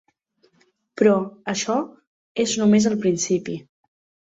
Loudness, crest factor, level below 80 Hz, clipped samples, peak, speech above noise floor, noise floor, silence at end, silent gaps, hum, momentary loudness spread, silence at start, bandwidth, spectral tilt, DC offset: -21 LUFS; 20 dB; -64 dBFS; under 0.1%; -4 dBFS; 44 dB; -64 dBFS; 0.7 s; 2.07-2.35 s; none; 16 LU; 0.95 s; 8 kHz; -4.5 dB/octave; under 0.1%